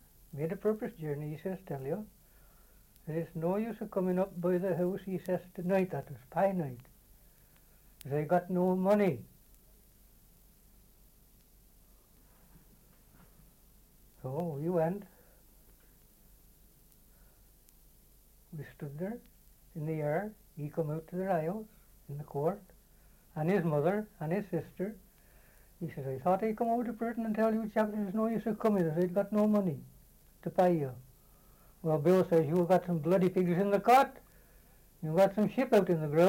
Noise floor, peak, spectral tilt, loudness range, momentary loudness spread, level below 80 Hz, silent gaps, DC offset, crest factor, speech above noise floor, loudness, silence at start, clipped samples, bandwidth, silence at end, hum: -62 dBFS; -12 dBFS; -8 dB/octave; 11 LU; 16 LU; -64 dBFS; none; under 0.1%; 20 dB; 31 dB; -32 LUFS; 0.35 s; under 0.1%; 17 kHz; 0 s; none